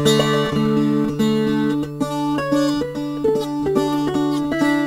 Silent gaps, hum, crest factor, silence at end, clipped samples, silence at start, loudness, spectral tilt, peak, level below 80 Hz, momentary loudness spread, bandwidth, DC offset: none; none; 16 dB; 0 s; under 0.1%; 0 s; -19 LUFS; -5.5 dB/octave; -4 dBFS; -46 dBFS; 5 LU; 16 kHz; 0.2%